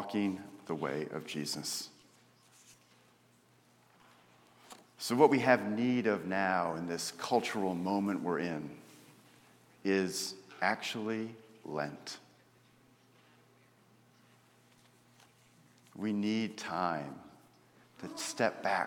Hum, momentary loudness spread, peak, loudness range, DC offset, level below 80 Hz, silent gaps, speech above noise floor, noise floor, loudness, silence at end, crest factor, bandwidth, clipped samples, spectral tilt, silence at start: 60 Hz at -65 dBFS; 18 LU; -10 dBFS; 14 LU; under 0.1%; -80 dBFS; none; 33 dB; -66 dBFS; -34 LUFS; 0 s; 26 dB; 18 kHz; under 0.1%; -4.5 dB/octave; 0 s